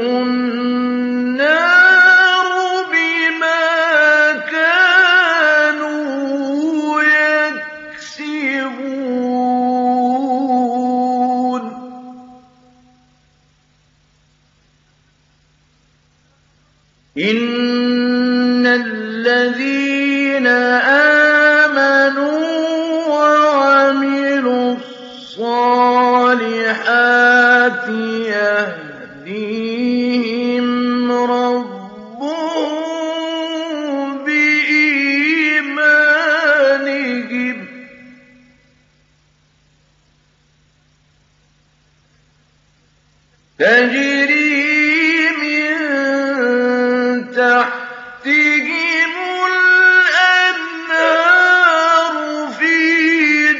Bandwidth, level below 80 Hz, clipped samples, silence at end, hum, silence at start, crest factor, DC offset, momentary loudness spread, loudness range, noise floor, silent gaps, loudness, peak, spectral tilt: 7.6 kHz; -66 dBFS; under 0.1%; 0 s; none; 0 s; 14 dB; under 0.1%; 12 LU; 8 LU; -56 dBFS; none; -13 LUFS; 0 dBFS; 0 dB/octave